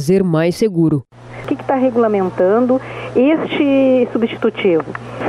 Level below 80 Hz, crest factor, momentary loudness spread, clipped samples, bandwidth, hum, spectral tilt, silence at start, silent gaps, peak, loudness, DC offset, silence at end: -50 dBFS; 12 dB; 9 LU; under 0.1%; 13.5 kHz; none; -7.5 dB/octave; 0 s; none; -4 dBFS; -15 LUFS; under 0.1%; 0 s